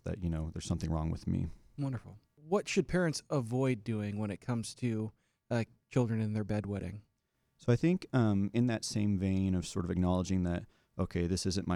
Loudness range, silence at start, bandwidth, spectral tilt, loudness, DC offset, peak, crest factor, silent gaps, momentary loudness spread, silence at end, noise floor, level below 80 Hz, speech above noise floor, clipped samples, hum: 4 LU; 0.05 s; 13 kHz; -6.5 dB/octave; -34 LUFS; under 0.1%; -16 dBFS; 18 dB; none; 9 LU; 0 s; -79 dBFS; -52 dBFS; 46 dB; under 0.1%; none